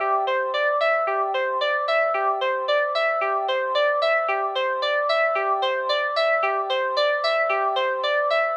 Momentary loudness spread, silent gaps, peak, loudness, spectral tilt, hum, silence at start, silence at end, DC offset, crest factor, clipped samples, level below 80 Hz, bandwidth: 3 LU; none; -10 dBFS; -22 LUFS; 0 dB/octave; none; 0 s; 0 s; under 0.1%; 12 dB; under 0.1%; -88 dBFS; 8.4 kHz